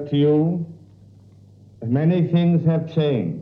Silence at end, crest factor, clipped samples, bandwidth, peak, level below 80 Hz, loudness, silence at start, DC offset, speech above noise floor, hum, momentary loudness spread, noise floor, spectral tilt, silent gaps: 0 s; 12 dB; under 0.1%; 4.3 kHz; -8 dBFS; -64 dBFS; -20 LUFS; 0 s; under 0.1%; 29 dB; 50 Hz at -45 dBFS; 10 LU; -48 dBFS; -10.5 dB/octave; none